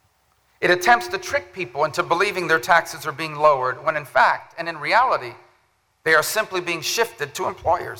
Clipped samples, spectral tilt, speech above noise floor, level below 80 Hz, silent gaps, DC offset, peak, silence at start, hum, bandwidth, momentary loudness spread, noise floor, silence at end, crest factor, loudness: under 0.1%; -3 dB/octave; 43 dB; -56 dBFS; none; under 0.1%; 0 dBFS; 0.6 s; none; over 20 kHz; 10 LU; -64 dBFS; 0 s; 22 dB; -20 LUFS